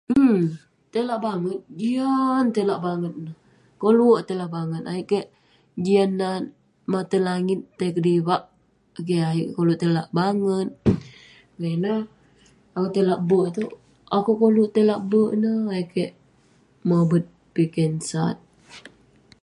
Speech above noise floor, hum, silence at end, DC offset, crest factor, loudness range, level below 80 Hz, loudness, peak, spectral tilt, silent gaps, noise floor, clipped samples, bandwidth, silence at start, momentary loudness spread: 37 dB; none; 0.55 s; under 0.1%; 18 dB; 4 LU; -54 dBFS; -23 LUFS; -6 dBFS; -7.5 dB/octave; none; -58 dBFS; under 0.1%; 11.5 kHz; 0.1 s; 12 LU